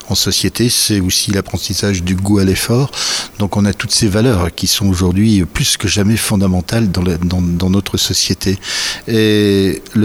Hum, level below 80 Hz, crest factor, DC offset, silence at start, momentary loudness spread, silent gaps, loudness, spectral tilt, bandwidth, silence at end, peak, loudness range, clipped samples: none; -34 dBFS; 12 dB; under 0.1%; 0 s; 5 LU; none; -14 LUFS; -4.5 dB/octave; 17 kHz; 0 s; -2 dBFS; 1 LU; under 0.1%